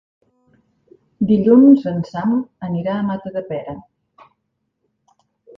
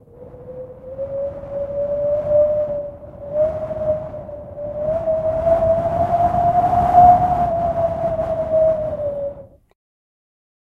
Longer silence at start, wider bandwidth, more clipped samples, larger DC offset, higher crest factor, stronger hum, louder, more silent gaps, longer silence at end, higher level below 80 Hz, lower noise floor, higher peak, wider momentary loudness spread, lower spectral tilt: first, 1.2 s vs 0.15 s; first, 5.6 kHz vs 4.7 kHz; neither; neither; about the same, 18 dB vs 18 dB; neither; about the same, -17 LUFS vs -18 LUFS; neither; first, 1.8 s vs 1.25 s; second, -56 dBFS vs -40 dBFS; first, -73 dBFS vs -39 dBFS; about the same, 0 dBFS vs 0 dBFS; about the same, 18 LU vs 18 LU; about the same, -10 dB/octave vs -9 dB/octave